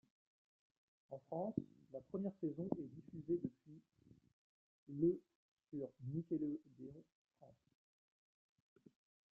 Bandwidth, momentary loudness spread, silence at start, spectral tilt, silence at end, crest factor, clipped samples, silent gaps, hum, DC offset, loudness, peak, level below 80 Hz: 2 kHz; 18 LU; 1.1 s; -12.5 dB/octave; 1.8 s; 24 dB; under 0.1%; 4.33-4.87 s, 5.35-5.57 s, 7.12-7.25 s; none; under 0.1%; -45 LUFS; -24 dBFS; -80 dBFS